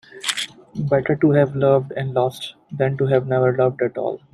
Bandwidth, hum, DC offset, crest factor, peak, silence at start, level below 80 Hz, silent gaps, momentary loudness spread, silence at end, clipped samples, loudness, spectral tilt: 14 kHz; none; under 0.1%; 16 dB; -4 dBFS; 0.15 s; -58 dBFS; none; 10 LU; 0.15 s; under 0.1%; -20 LUFS; -6 dB/octave